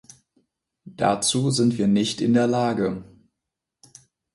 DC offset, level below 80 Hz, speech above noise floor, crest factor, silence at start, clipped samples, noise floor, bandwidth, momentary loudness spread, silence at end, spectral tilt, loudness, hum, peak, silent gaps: under 0.1%; -60 dBFS; 63 dB; 16 dB; 0.85 s; under 0.1%; -84 dBFS; 11.5 kHz; 6 LU; 1.3 s; -5 dB/octave; -22 LUFS; none; -8 dBFS; none